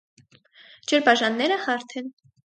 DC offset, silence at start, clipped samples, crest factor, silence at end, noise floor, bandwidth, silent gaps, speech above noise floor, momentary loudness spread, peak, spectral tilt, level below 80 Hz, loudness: under 0.1%; 0.9 s; under 0.1%; 22 dB; 0.45 s; -54 dBFS; 9.2 kHz; none; 31 dB; 17 LU; -2 dBFS; -2.5 dB/octave; -76 dBFS; -22 LUFS